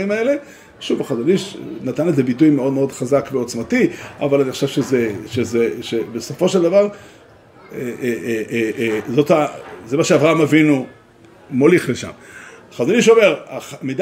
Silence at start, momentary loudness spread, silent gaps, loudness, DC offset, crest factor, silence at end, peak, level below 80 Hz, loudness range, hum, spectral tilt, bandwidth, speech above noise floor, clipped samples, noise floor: 0 s; 14 LU; none; -17 LUFS; under 0.1%; 18 dB; 0 s; 0 dBFS; -58 dBFS; 4 LU; none; -5.5 dB/octave; 16 kHz; 29 dB; under 0.1%; -46 dBFS